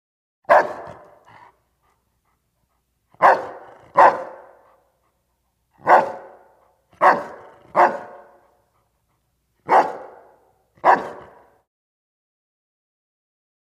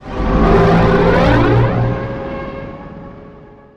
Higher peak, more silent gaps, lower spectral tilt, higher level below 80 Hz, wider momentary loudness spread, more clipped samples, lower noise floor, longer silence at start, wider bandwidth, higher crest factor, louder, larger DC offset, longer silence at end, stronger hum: about the same, -2 dBFS vs 0 dBFS; neither; second, -5 dB/octave vs -8.5 dB/octave; second, -68 dBFS vs -22 dBFS; first, 24 LU vs 21 LU; neither; first, -70 dBFS vs -39 dBFS; first, 0.5 s vs 0 s; first, 13.5 kHz vs 7.4 kHz; first, 22 dB vs 14 dB; second, -18 LUFS vs -13 LUFS; neither; first, 2.45 s vs 0.2 s; neither